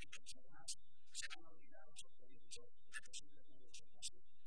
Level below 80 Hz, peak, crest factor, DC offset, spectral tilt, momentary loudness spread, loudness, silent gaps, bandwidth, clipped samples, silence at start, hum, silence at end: -78 dBFS; -34 dBFS; 24 dB; 0.6%; -0.5 dB/octave; 11 LU; -55 LUFS; none; 11 kHz; under 0.1%; 0 s; none; 0 s